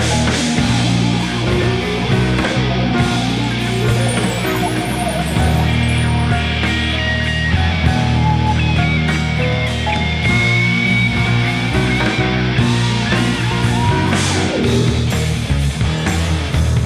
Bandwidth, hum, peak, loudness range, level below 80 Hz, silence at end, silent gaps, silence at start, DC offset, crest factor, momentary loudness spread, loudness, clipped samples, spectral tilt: 13.5 kHz; none; 0 dBFS; 2 LU; -26 dBFS; 0 s; none; 0 s; under 0.1%; 14 dB; 3 LU; -16 LUFS; under 0.1%; -5.5 dB/octave